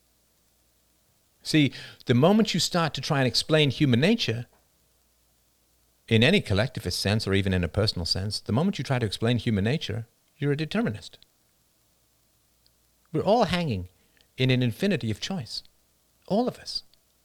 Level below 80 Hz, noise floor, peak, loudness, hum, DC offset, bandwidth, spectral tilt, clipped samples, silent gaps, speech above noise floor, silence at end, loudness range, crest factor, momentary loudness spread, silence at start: -54 dBFS; -66 dBFS; -6 dBFS; -25 LUFS; none; under 0.1%; 16.5 kHz; -5.5 dB/octave; under 0.1%; none; 42 dB; 0.45 s; 7 LU; 20 dB; 13 LU; 1.45 s